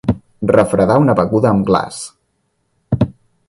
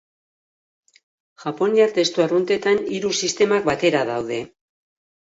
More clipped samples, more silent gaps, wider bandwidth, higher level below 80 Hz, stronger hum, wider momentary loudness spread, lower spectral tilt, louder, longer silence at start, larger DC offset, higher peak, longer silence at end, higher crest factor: neither; neither; first, 11.5 kHz vs 8 kHz; first, -38 dBFS vs -62 dBFS; neither; about the same, 12 LU vs 12 LU; first, -7.5 dB/octave vs -4 dB/octave; first, -15 LUFS vs -20 LUFS; second, 0.05 s vs 1.4 s; neither; first, 0 dBFS vs -4 dBFS; second, 0.4 s vs 0.75 s; about the same, 16 dB vs 18 dB